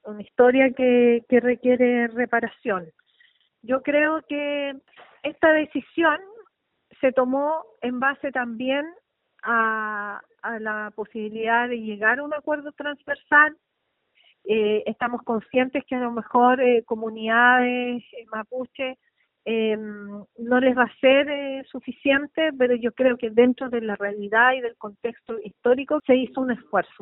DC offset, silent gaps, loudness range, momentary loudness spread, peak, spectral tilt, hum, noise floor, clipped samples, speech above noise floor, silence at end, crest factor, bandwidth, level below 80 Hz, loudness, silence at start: under 0.1%; none; 5 LU; 14 LU; -4 dBFS; -2 dB/octave; none; -75 dBFS; under 0.1%; 53 dB; 0.2 s; 18 dB; 3.9 kHz; -66 dBFS; -22 LUFS; 0.05 s